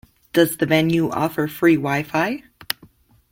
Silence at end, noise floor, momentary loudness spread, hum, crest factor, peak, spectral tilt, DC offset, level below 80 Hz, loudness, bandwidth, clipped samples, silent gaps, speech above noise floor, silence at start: 0.6 s; -52 dBFS; 12 LU; none; 18 dB; -2 dBFS; -5.5 dB/octave; under 0.1%; -56 dBFS; -20 LUFS; 16.5 kHz; under 0.1%; none; 33 dB; 0.35 s